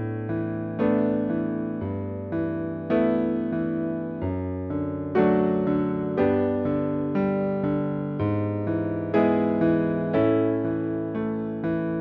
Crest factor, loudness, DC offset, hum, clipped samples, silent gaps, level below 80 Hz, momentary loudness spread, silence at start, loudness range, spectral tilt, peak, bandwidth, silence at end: 16 dB; -25 LUFS; under 0.1%; none; under 0.1%; none; -54 dBFS; 7 LU; 0 s; 3 LU; -8.5 dB/octave; -8 dBFS; 5 kHz; 0 s